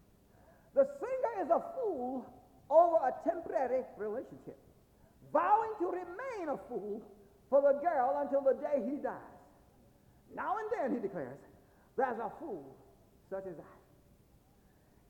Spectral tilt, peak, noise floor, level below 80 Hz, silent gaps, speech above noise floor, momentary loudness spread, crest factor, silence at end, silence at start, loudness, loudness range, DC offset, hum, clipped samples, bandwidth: -7.5 dB/octave; -14 dBFS; -66 dBFS; -70 dBFS; none; 32 dB; 17 LU; 22 dB; 1.35 s; 0.75 s; -34 LUFS; 8 LU; under 0.1%; none; under 0.1%; 8.6 kHz